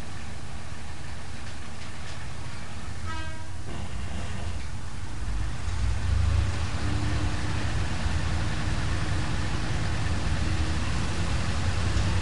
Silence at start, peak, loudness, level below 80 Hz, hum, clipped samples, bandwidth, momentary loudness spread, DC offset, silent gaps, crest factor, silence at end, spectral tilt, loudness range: 0 s; -12 dBFS; -31 LUFS; -34 dBFS; none; under 0.1%; 10.5 kHz; 11 LU; 4%; none; 16 dB; 0 s; -5 dB/octave; 9 LU